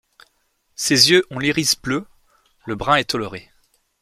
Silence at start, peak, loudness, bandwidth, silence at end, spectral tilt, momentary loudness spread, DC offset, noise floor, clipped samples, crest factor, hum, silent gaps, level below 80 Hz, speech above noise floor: 0.8 s; 0 dBFS; -17 LUFS; 16 kHz; 0.6 s; -2.5 dB/octave; 21 LU; under 0.1%; -66 dBFS; under 0.1%; 22 dB; none; none; -52 dBFS; 48 dB